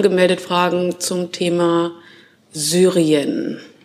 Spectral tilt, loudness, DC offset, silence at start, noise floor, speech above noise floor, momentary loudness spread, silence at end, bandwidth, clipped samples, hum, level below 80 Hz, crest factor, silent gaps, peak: -4.5 dB/octave; -18 LUFS; under 0.1%; 0 s; -47 dBFS; 30 dB; 10 LU; 0.2 s; 15.5 kHz; under 0.1%; none; -70 dBFS; 16 dB; none; -2 dBFS